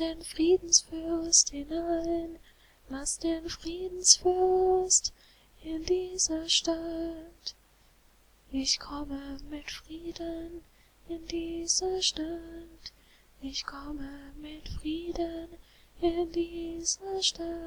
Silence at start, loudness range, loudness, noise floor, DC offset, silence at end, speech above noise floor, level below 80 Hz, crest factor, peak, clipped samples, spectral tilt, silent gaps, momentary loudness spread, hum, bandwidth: 0 s; 10 LU; -28 LUFS; -62 dBFS; under 0.1%; 0 s; 31 dB; -50 dBFS; 26 dB; -4 dBFS; under 0.1%; -1.5 dB/octave; none; 20 LU; none; 19 kHz